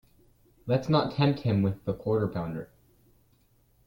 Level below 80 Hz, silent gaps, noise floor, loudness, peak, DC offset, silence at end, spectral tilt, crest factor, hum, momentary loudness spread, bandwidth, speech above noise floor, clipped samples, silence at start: -58 dBFS; none; -65 dBFS; -28 LUFS; -10 dBFS; under 0.1%; 1.2 s; -8.5 dB/octave; 20 dB; none; 14 LU; 16.5 kHz; 38 dB; under 0.1%; 0.65 s